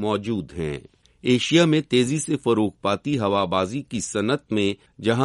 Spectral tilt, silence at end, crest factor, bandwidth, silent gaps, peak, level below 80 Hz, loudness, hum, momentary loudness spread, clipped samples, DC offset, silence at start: -5 dB/octave; 0 s; 18 dB; 11.5 kHz; none; -4 dBFS; -54 dBFS; -23 LUFS; none; 11 LU; under 0.1%; under 0.1%; 0 s